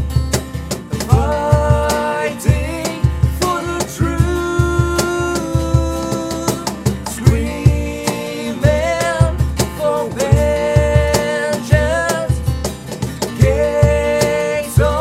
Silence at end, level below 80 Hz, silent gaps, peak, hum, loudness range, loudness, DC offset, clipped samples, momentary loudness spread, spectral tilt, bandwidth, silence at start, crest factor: 0 s; -24 dBFS; none; 0 dBFS; none; 2 LU; -17 LUFS; under 0.1%; under 0.1%; 7 LU; -5.5 dB/octave; 16 kHz; 0 s; 16 dB